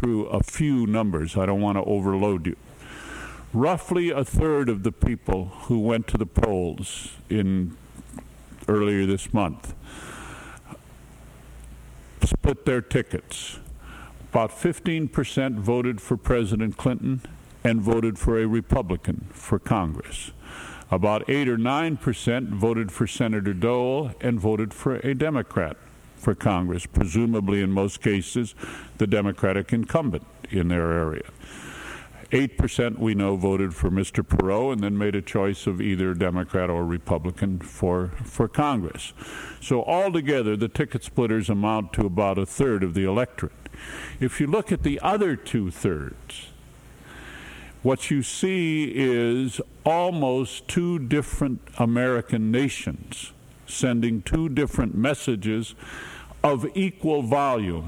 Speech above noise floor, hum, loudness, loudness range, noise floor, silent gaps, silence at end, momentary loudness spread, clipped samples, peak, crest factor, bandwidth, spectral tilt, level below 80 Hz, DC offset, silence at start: 23 dB; none; -25 LUFS; 3 LU; -47 dBFS; none; 0 s; 15 LU; under 0.1%; -4 dBFS; 20 dB; 16 kHz; -6.5 dB/octave; -38 dBFS; under 0.1%; 0 s